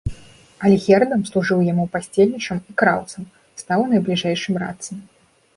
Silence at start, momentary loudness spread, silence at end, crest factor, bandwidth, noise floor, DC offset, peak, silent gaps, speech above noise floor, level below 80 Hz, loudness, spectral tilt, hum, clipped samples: 0.05 s; 18 LU; 0.55 s; 18 dB; 11.5 kHz; -40 dBFS; under 0.1%; -2 dBFS; none; 21 dB; -44 dBFS; -19 LUFS; -6 dB/octave; none; under 0.1%